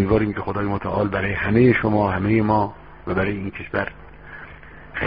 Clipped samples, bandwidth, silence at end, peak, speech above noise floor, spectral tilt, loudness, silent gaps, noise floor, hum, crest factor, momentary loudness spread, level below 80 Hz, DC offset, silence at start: under 0.1%; 5.2 kHz; 0 s; -4 dBFS; 21 dB; -6.5 dB/octave; -21 LUFS; none; -41 dBFS; none; 18 dB; 21 LU; -40 dBFS; 0.3%; 0 s